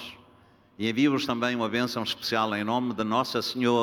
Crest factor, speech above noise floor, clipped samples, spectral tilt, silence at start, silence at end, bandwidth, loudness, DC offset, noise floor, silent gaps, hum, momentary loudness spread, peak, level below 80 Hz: 18 dB; 31 dB; under 0.1%; -5 dB/octave; 0 s; 0 s; 18 kHz; -27 LUFS; under 0.1%; -58 dBFS; none; none; 5 LU; -10 dBFS; -66 dBFS